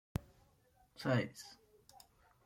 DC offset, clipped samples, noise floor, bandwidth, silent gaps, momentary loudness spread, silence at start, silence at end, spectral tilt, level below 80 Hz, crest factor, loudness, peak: under 0.1%; under 0.1%; -71 dBFS; 16.5 kHz; none; 26 LU; 0.15 s; 0.9 s; -6 dB/octave; -64 dBFS; 22 dB; -39 LUFS; -22 dBFS